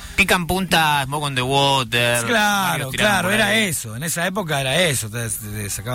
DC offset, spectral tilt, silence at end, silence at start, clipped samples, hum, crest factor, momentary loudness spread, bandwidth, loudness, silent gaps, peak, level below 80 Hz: under 0.1%; -3 dB/octave; 0 s; 0 s; under 0.1%; none; 14 dB; 8 LU; 16.5 kHz; -18 LUFS; none; -4 dBFS; -42 dBFS